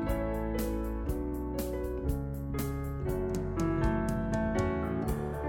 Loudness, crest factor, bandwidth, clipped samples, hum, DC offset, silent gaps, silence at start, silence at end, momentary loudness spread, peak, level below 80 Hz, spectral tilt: -33 LUFS; 14 dB; 17 kHz; under 0.1%; none; under 0.1%; none; 0 s; 0 s; 5 LU; -18 dBFS; -38 dBFS; -7.5 dB/octave